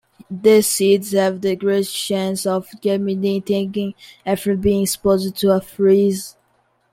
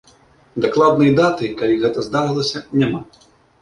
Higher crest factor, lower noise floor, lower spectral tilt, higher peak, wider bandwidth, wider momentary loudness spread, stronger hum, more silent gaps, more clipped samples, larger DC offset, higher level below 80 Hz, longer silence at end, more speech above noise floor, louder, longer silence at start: about the same, 16 dB vs 16 dB; first, -62 dBFS vs -51 dBFS; second, -5 dB/octave vs -6.5 dB/octave; about the same, -2 dBFS vs -2 dBFS; first, 16.5 kHz vs 11 kHz; about the same, 10 LU vs 8 LU; neither; neither; neither; neither; about the same, -48 dBFS vs -52 dBFS; about the same, 0.65 s vs 0.6 s; first, 45 dB vs 34 dB; about the same, -18 LUFS vs -17 LUFS; second, 0.3 s vs 0.55 s